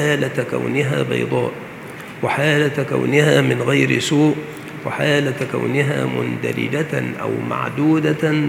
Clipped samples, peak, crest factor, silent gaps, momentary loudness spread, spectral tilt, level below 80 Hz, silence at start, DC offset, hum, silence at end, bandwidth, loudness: under 0.1%; 0 dBFS; 18 dB; none; 10 LU; -6 dB/octave; -60 dBFS; 0 s; under 0.1%; none; 0 s; 16 kHz; -18 LUFS